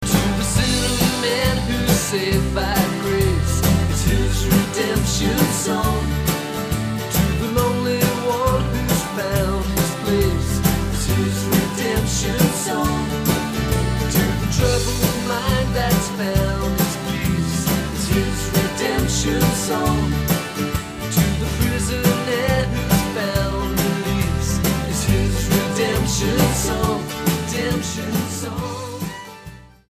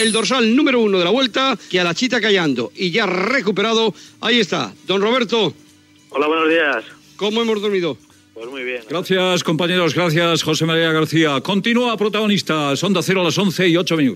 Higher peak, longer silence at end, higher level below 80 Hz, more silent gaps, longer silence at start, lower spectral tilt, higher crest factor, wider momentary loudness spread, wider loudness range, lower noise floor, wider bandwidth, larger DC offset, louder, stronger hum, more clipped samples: about the same, -2 dBFS vs -2 dBFS; first, 0.2 s vs 0 s; first, -28 dBFS vs -68 dBFS; neither; about the same, 0 s vs 0 s; about the same, -5 dB/octave vs -4.5 dB/octave; about the same, 18 dB vs 14 dB; second, 4 LU vs 8 LU; about the same, 1 LU vs 3 LU; second, -40 dBFS vs -46 dBFS; about the same, 15.5 kHz vs 15.5 kHz; neither; second, -20 LUFS vs -17 LUFS; neither; neither